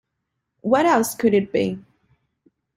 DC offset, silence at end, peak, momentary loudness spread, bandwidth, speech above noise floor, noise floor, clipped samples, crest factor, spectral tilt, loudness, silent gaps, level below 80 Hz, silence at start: under 0.1%; 0.95 s; -4 dBFS; 13 LU; 16 kHz; 59 dB; -78 dBFS; under 0.1%; 18 dB; -5 dB/octave; -20 LUFS; none; -60 dBFS; 0.65 s